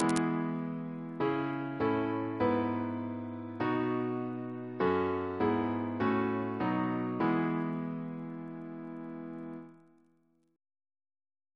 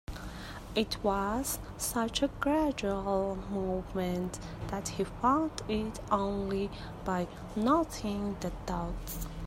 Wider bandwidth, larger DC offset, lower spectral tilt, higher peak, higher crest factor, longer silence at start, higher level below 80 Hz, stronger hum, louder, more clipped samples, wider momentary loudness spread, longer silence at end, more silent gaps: second, 11 kHz vs 16 kHz; neither; first, -7 dB/octave vs -5 dB/octave; about the same, -10 dBFS vs -12 dBFS; about the same, 24 dB vs 20 dB; about the same, 0 s vs 0.1 s; second, -68 dBFS vs -46 dBFS; neither; about the same, -34 LUFS vs -33 LUFS; neither; about the same, 12 LU vs 10 LU; first, 1.8 s vs 0 s; neither